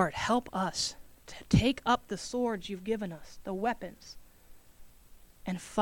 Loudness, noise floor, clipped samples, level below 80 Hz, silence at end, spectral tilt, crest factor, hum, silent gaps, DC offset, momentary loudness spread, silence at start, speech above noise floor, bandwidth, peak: -32 LUFS; -55 dBFS; under 0.1%; -50 dBFS; 0 s; -5 dB/octave; 22 dB; none; none; under 0.1%; 22 LU; 0 s; 23 dB; 19 kHz; -12 dBFS